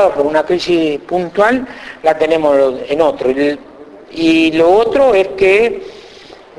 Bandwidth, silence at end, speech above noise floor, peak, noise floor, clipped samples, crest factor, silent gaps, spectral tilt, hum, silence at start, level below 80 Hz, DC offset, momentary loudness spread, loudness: 11 kHz; 0.5 s; 25 dB; 0 dBFS; -37 dBFS; under 0.1%; 12 dB; none; -5.5 dB/octave; none; 0 s; -46 dBFS; under 0.1%; 8 LU; -13 LUFS